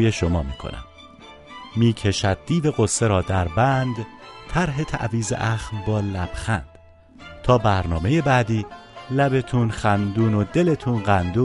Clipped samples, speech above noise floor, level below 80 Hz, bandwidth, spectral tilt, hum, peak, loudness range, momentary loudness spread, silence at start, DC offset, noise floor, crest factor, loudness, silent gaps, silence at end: under 0.1%; 27 dB; -38 dBFS; 11.5 kHz; -6 dB/octave; none; -4 dBFS; 4 LU; 13 LU; 0 s; under 0.1%; -47 dBFS; 18 dB; -22 LUFS; none; 0 s